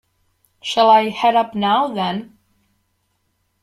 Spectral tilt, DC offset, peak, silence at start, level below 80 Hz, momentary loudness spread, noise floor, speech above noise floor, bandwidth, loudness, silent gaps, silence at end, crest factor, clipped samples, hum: -5 dB/octave; under 0.1%; -2 dBFS; 0.65 s; -64 dBFS; 12 LU; -68 dBFS; 52 dB; 14 kHz; -17 LUFS; none; 1.4 s; 16 dB; under 0.1%; none